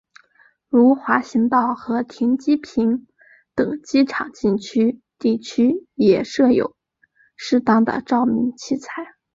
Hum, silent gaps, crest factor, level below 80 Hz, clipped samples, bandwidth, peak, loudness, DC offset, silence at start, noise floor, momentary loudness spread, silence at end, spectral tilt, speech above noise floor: none; none; 18 dB; -58 dBFS; under 0.1%; 7.6 kHz; -2 dBFS; -19 LUFS; under 0.1%; 0.75 s; -60 dBFS; 10 LU; 0.3 s; -6 dB/octave; 42 dB